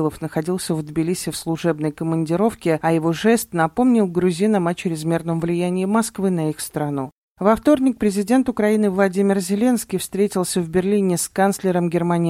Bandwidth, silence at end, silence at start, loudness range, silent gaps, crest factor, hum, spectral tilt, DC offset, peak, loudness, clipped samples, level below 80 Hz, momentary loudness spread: 16.5 kHz; 0 s; 0 s; 2 LU; 7.18-7.35 s; 16 dB; none; -6 dB/octave; under 0.1%; -4 dBFS; -20 LUFS; under 0.1%; -52 dBFS; 6 LU